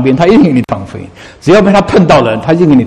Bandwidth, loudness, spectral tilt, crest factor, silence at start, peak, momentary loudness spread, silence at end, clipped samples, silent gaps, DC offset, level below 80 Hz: 10.5 kHz; -8 LUFS; -7 dB/octave; 8 dB; 0 s; 0 dBFS; 13 LU; 0 s; 2%; none; under 0.1%; -34 dBFS